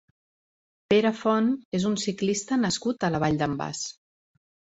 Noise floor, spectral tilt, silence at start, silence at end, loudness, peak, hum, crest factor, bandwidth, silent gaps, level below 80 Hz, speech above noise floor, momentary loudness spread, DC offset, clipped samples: under -90 dBFS; -5 dB/octave; 0.9 s; 0.8 s; -26 LUFS; -8 dBFS; none; 18 dB; 8.2 kHz; 1.65-1.72 s; -60 dBFS; over 65 dB; 7 LU; under 0.1%; under 0.1%